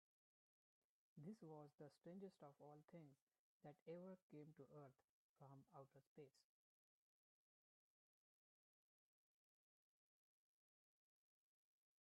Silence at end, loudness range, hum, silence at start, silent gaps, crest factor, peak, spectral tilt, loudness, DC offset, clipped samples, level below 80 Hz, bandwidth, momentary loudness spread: 5.6 s; 3 LU; none; 1.15 s; 3.22-3.27 s, 3.39-3.60 s, 3.82-3.86 s, 4.22-4.30 s, 5.04-5.36 s, 6.07-6.16 s; 20 dB; -48 dBFS; -8 dB/octave; -64 LUFS; under 0.1%; under 0.1%; under -90 dBFS; 4.8 kHz; 8 LU